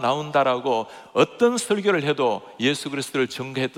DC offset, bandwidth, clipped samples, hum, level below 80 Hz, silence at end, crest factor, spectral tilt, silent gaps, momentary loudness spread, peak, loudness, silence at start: under 0.1%; 16 kHz; under 0.1%; none; -72 dBFS; 0 s; 18 dB; -4.5 dB/octave; none; 7 LU; -4 dBFS; -23 LUFS; 0 s